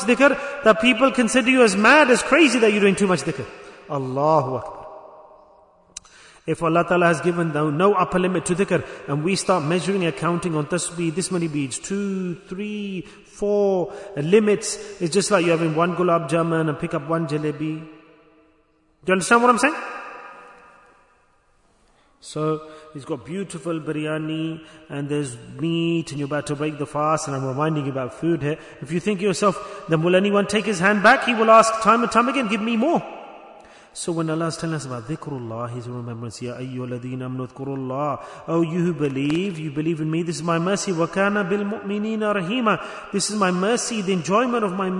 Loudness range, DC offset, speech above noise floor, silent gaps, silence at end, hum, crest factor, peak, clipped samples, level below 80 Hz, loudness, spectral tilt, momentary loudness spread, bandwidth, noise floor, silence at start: 11 LU; under 0.1%; 40 dB; none; 0 s; none; 20 dB; -2 dBFS; under 0.1%; -58 dBFS; -21 LUFS; -5 dB/octave; 16 LU; 11 kHz; -61 dBFS; 0 s